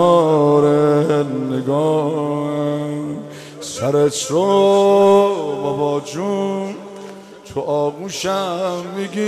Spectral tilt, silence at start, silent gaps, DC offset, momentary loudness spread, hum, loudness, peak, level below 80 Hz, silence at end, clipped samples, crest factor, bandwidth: -6 dB/octave; 0 s; none; under 0.1%; 16 LU; none; -17 LUFS; -2 dBFS; -62 dBFS; 0 s; under 0.1%; 14 dB; 14 kHz